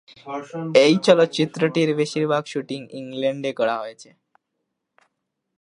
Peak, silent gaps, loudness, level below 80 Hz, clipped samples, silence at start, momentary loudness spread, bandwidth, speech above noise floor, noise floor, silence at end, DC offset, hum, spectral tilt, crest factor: -2 dBFS; none; -21 LUFS; -74 dBFS; under 0.1%; 0.25 s; 16 LU; 11 kHz; 57 dB; -78 dBFS; 1.55 s; under 0.1%; none; -5.5 dB/octave; 22 dB